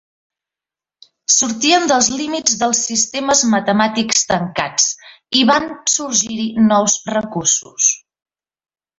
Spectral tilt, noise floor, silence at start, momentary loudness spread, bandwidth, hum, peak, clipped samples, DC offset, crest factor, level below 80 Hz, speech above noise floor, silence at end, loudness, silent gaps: -2 dB/octave; -89 dBFS; 1.3 s; 5 LU; 8 kHz; none; 0 dBFS; under 0.1%; under 0.1%; 18 dB; -56 dBFS; 73 dB; 1 s; -15 LUFS; none